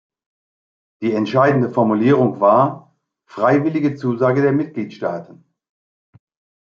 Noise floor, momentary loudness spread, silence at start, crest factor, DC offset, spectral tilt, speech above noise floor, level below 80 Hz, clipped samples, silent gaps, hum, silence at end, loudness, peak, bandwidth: under -90 dBFS; 11 LU; 1 s; 18 dB; under 0.1%; -9 dB/octave; over 74 dB; -66 dBFS; under 0.1%; none; none; 1.5 s; -17 LUFS; -2 dBFS; 7 kHz